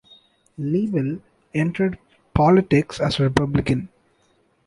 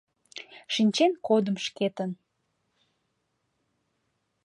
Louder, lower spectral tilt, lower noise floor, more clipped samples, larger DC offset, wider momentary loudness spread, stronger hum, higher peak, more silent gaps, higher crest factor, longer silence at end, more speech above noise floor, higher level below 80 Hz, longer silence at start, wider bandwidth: first, -21 LUFS vs -26 LUFS; first, -7.5 dB/octave vs -5 dB/octave; second, -63 dBFS vs -77 dBFS; neither; neither; second, 14 LU vs 21 LU; neither; first, -2 dBFS vs -10 dBFS; neither; about the same, 20 dB vs 20 dB; second, 0.8 s vs 2.3 s; second, 43 dB vs 51 dB; first, -42 dBFS vs -80 dBFS; first, 0.6 s vs 0.35 s; about the same, 11.5 kHz vs 11.5 kHz